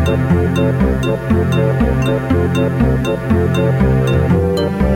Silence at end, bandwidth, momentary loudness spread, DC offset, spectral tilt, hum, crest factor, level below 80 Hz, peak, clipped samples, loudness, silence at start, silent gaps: 0 s; 14.5 kHz; 2 LU; under 0.1%; -8 dB/octave; none; 12 dB; -24 dBFS; -2 dBFS; under 0.1%; -15 LUFS; 0 s; none